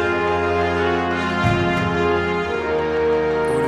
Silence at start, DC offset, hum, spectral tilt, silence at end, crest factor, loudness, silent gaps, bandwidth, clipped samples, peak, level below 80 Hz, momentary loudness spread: 0 s; under 0.1%; none; -6.5 dB/octave; 0 s; 16 dB; -19 LUFS; none; 12 kHz; under 0.1%; -4 dBFS; -40 dBFS; 2 LU